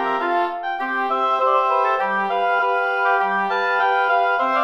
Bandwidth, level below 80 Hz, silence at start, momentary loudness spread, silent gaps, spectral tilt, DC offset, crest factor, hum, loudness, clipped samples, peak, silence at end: 8.8 kHz; -72 dBFS; 0 s; 4 LU; none; -4.5 dB/octave; 0.1%; 14 dB; none; -19 LUFS; under 0.1%; -6 dBFS; 0 s